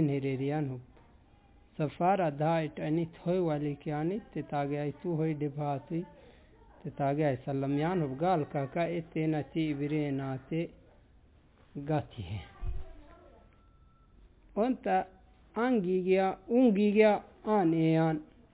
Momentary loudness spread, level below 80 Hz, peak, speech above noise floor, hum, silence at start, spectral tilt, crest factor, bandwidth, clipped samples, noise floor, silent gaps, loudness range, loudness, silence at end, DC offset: 15 LU; -54 dBFS; -12 dBFS; 31 dB; none; 0 s; -7 dB/octave; 18 dB; 4 kHz; under 0.1%; -61 dBFS; none; 11 LU; -31 LUFS; 0.3 s; under 0.1%